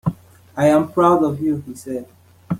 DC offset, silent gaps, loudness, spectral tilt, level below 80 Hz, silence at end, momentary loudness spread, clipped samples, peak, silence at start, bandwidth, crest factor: under 0.1%; none; -18 LUFS; -7.5 dB/octave; -52 dBFS; 0 s; 15 LU; under 0.1%; -2 dBFS; 0.05 s; 16 kHz; 16 dB